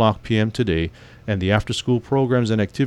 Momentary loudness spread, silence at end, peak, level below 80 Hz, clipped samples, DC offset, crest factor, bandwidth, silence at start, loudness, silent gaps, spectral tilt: 7 LU; 0 s; -4 dBFS; -40 dBFS; under 0.1%; under 0.1%; 16 dB; 11.5 kHz; 0 s; -21 LUFS; none; -6.5 dB/octave